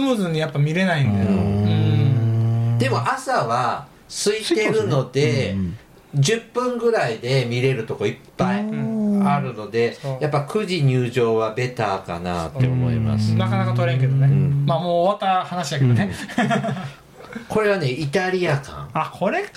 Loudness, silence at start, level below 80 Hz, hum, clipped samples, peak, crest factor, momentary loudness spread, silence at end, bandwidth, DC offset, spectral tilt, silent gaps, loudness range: -21 LUFS; 0 s; -50 dBFS; none; under 0.1%; -8 dBFS; 12 dB; 7 LU; 0.1 s; 13 kHz; under 0.1%; -6.5 dB/octave; none; 3 LU